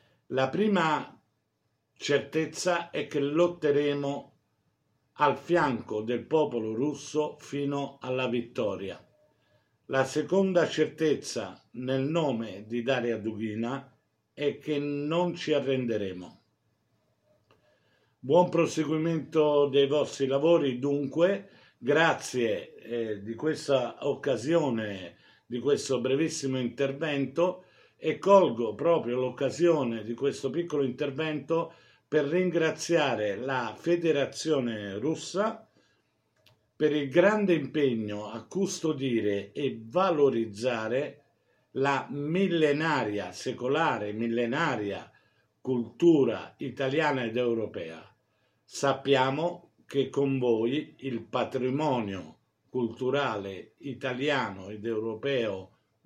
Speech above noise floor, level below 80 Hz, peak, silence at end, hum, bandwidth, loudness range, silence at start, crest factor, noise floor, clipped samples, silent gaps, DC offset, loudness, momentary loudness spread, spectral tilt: 49 dB; -74 dBFS; -8 dBFS; 0.4 s; none; 12.5 kHz; 5 LU; 0.3 s; 22 dB; -77 dBFS; under 0.1%; none; under 0.1%; -28 LUFS; 11 LU; -5.5 dB/octave